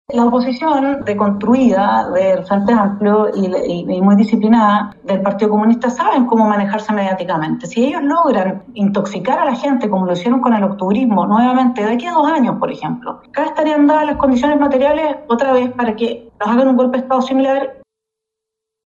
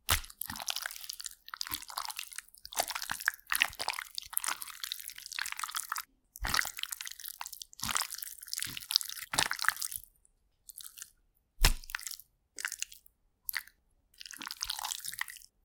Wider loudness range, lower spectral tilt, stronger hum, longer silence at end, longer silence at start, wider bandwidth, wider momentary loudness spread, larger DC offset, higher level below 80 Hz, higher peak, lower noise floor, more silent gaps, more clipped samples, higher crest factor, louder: about the same, 2 LU vs 4 LU; first, -7 dB/octave vs 0 dB/octave; neither; first, 1.25 s vs 0.2 s; about the same, 0.1 s vs 0.1 s; second, 7.6 kHz vs 19 kHz; second, 7 LU vs 14 LU; neither; about the same, -50 dBFS vs -46 dBFS; about the same, 0 dBFS vs -2 dBFS; first, -81 dBFS vs -71 dBFS; neither; neither; second, 14 dB vs 36 dB; first, -15 LUFS vs -35 LUFS